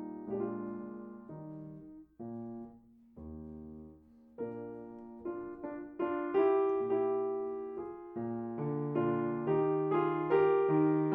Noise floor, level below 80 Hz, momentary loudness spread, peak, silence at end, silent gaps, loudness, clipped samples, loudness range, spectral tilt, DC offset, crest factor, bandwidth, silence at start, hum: -58 dBFS; -66 dBFS; 20 LU; -16 dBFS; 0 s; none; -34 LUFS; under 0.1%; 15 LU; -11 dB/octave; under 0.1%; 18 dB; 3.8 kHz; 0 s; none